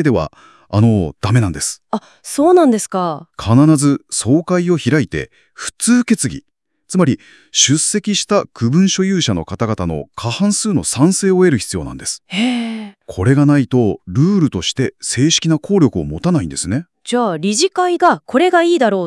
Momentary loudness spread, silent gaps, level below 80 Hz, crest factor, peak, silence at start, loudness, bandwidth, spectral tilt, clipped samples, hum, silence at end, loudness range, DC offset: 11 LU; none; -46 dBFS; 14 dB; 0 dBFS; 0 s; -15 LUFS; 12 kHz; -5 dB/octave; under 0.1%; none; 0 s; 2 LU; under 0.1%